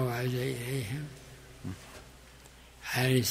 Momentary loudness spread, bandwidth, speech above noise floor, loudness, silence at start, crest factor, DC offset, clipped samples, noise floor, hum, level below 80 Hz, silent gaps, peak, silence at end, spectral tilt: 24 LU; 16 kHz; 22 dB; -33 LUFS; 0 s; 20 dB; under 0.1%; under 0.1%; -54 dBFS; none; -58 dBFS; none; -14 dBFS; 0 s; -5 dB/octave